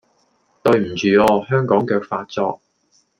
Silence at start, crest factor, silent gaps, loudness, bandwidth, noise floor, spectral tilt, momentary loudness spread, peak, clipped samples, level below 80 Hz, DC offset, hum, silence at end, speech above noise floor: 0.65 s; 18 dB; none; -18 LUFS; 15.5 kHz; -62 dBFS; -6.5 dB/octave; 10 LU; 0 dBFS; under 0.1%; -54 dBFS; under 0.1%; none; 0.65 s; 44 dB